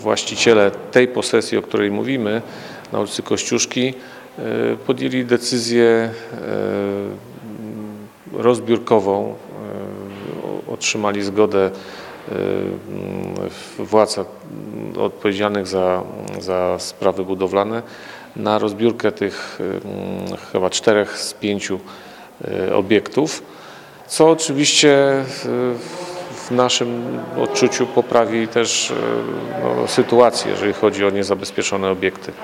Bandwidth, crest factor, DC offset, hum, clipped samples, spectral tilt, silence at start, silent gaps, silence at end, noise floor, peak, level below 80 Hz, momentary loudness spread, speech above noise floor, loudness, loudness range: 16.5 kHz; 20 dB; under 0.1%; none; under 0.1%; -4 dB/octave; 0 s; none; 0 s; -39 dBFS; 0 dBFS; -62 dBFS; 16 LU; 21 dB; -19 LUFS; 5 LU